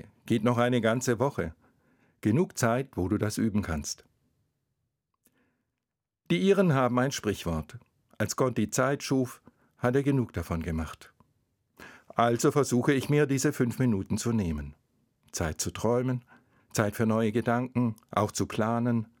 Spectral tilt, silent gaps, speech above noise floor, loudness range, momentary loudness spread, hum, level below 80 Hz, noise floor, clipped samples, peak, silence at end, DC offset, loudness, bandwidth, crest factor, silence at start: -5.5 dB/octave; none; 60 dB; 4 LU; 10 LU; none; -54 dBFS; -87 dBFS; under 0.1%; -8 dBFS; 0.15 s; under 0.1%; -28 LUFS; 18 kHz; 20 dB; 0.05 s